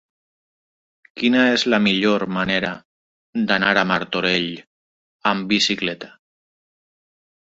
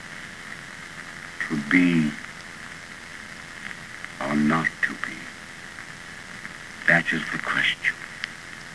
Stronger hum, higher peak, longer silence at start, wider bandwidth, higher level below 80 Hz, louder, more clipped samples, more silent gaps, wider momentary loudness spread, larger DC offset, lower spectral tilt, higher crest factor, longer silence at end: neither; about the same, -2 dBFS vs -4 dBFS; first, 1.15 s vs 0 s; second, 8 kHz vs 11 kHz; about the same, -58 dBFS vs -60 dBFS; first, -19 LUFS vs -24 LUFS; neither; first, 2.85-3.33 s, 4.67-5.20 s vs none; second, 13 LU vs 18 LU; second, under 0.1% vs 0.2%; about the same, -4.5 dB/octave vs -4.5 dB/octave; about the same, 20 dB vs 24 dB; first, 1.45 s vs 0 s